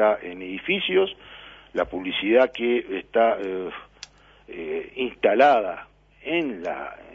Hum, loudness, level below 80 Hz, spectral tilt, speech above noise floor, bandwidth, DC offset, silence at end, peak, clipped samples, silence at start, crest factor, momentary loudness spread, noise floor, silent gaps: none; -23 LUFS; -58 dBFS; -5.5 dB/octave; 24 dB; 7.6 kHz; under 0.1%; 0.15 s; -4 dBFS; under 0.1%; 0 s; 20 dB; 21 LU; -47 dBFS; none